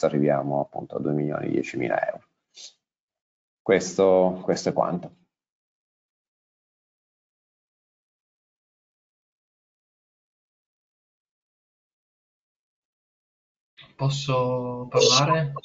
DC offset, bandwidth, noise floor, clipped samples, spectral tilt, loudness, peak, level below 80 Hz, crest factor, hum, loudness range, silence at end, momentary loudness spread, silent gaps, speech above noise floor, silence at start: under 0.1%; 8 kHz; -48 dBFS; under 0.1%; -4.5 dB/octave; -24 LUFS; -6 dBFS; -64 dBFS; 22 dB; none; 8 LU; 0.05 s; 13 LU; 3.00-3.08 s, 3.21-3.65 s, 5.52-13.77 s; 25 dB; 0 s